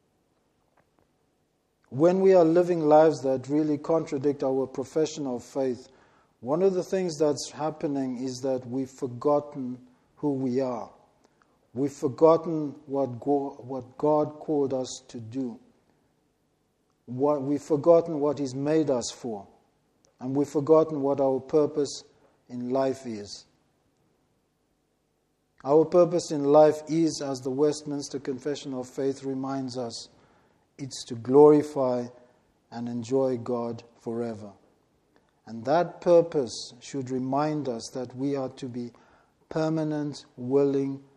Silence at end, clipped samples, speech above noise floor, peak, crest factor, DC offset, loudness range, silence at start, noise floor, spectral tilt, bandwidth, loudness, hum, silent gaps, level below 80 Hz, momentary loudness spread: 0.2 s; under 0.1%; 47 dB; -6 dBFS; 22 dB; under 0.1%; 8 LU; 1.9 s; -72 dBFS; -6.5 dB/octave; 11.5 kHz; -26 LUFS; none; none; -70 dBFS; 16 LU